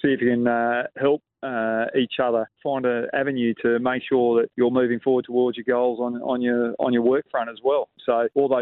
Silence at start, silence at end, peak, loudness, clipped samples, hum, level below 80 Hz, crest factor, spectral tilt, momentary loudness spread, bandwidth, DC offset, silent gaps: 0.05 s; 0 s; -8 dBFS; -23 LUFS; under 0.1%; none; -68 dBFS; 14 dB; -10.5 dB/octave; 4 LU; 4.1 kHz; under 0.1%; none